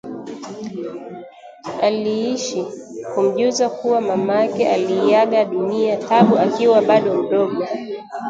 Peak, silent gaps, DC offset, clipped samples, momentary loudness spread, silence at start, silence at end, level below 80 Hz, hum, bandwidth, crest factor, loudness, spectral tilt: 0 dBFS; none; under 0.1%; under 0.1%; 17 LU; 0.05 s; 0 s; -66 dBFS; none; 9 kHz; 18 dB; -18 LUFS; -5.5 dB/octave